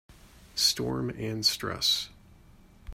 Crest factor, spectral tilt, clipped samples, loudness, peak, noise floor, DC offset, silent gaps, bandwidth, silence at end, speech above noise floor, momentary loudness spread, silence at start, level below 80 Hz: 20 dB; -2.5 dB/octave; under 0.1%; -27 LUFS; -12 dBFS; -55 dBFS; under 0.1%; none; 16 kHz; 0 s; 26 dB; 9 LU; 0.1 s; -52 dBFS